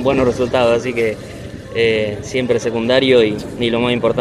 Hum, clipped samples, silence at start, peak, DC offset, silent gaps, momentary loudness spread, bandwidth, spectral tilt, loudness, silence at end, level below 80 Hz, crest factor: none; under 0.1%; 0 s; 0 dBFS; under 0.1%; none; 9 LU; 12.5 kHz; -5.5 dB/octave; -16 LUFS; 0 s; -42 dBFS; 16 dB